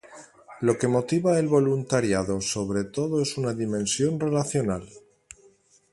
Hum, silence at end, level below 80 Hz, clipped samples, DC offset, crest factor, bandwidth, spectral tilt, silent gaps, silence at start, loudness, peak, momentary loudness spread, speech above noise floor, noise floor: none; 0.95 s; -54 dBFS; under 0.1%; under 0.1%; 18 dB; 11.5 kHz; -5.5 dB/octave; none; 0.05 s; -25 LUFS; -8 dBFS; 6 LU; 35 dB; -59 dBFS